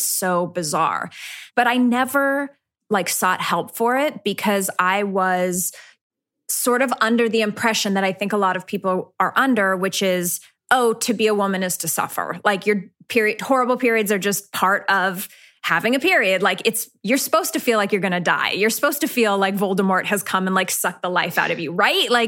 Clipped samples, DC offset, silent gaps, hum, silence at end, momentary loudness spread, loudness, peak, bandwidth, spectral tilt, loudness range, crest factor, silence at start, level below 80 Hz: under 0.1%; under 0.1%; 6.01-6.10 s; none; 0 s; 6 LU; -20 LUFS; -2 dBFS; 17 kHz; -3 dB/octave; 2 LU; 18 dB; 0 s; -74 dBFS